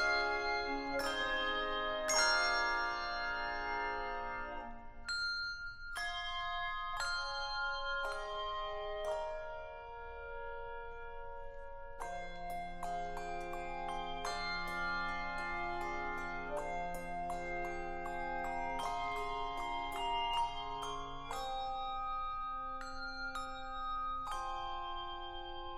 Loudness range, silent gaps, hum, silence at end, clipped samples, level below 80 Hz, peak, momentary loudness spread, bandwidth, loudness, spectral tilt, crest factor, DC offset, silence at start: 10 LU; none; none; 0 s; under 0.1%; -50 dBFS; -18 dBFS; 11 LU; 13.5 kHz; -39 LUFS; -2 dB/octave; 20 dB; under 0.1%; 0 s